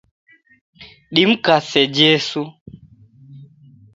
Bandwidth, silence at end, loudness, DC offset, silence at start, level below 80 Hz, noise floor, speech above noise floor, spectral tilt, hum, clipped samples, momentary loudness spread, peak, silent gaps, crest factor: 8.2 kHz; 0.5 s; -15 LUFS; under 0.1%; 0.8 s; -60 dBFS; -47 dBFS; 31 dB; -4.5 dB/octave; none; under 0.1%; 12 LU; 0 dBFS; 2.61-2.66 s; 20 dB